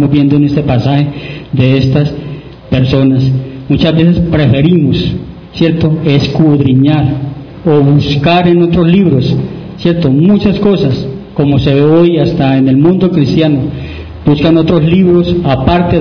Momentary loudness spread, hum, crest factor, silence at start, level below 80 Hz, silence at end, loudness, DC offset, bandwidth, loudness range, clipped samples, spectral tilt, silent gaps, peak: 9 LU; none; 8 dB; 0 s; -30 dBFS; 0 s; -9 LUFS; 0.2%; 5.4 kHz; 2 LU; 1%; -9 dB/octave; none; 0 dBFS